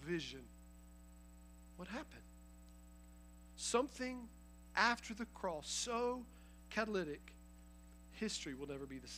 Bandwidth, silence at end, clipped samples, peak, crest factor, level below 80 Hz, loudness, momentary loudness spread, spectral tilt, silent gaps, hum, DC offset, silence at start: 15.5 kHz; 0 s; under 0.1%; -18 dBFS; 26 dB; -62 dBFS; -42 LUFS; 23 LU; -3 dB/octave; none; 60 Hz at -60 dBFS; under 0.1%; 0 s